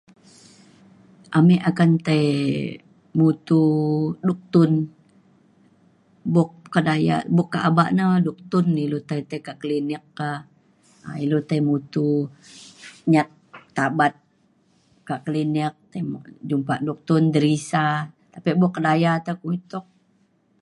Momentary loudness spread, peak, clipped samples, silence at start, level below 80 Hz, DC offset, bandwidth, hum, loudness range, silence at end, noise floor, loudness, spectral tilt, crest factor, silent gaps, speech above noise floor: 13 LU; -4 dBFS; under 0.1%; 1.3 s; -66 dBFS; under 0.1%; 11 kHz; none; 6 LU; 0.8 s; -63 dBFS; -22 LUFS; -7.5 dB/octave; 18 dB; none; 42 dB